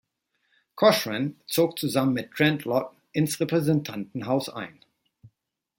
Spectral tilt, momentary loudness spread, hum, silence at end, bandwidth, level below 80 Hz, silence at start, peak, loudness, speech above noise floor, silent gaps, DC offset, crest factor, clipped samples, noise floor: -5.5 dB/octave; 13 LU; none; 0.5 s; 17 kHz; -68 dBFS; 0.75 s; -4 dBFS; -25 LUFS; 51 dB; none; under 0.1%; 22 dB; under 0.1%; -76 dBFS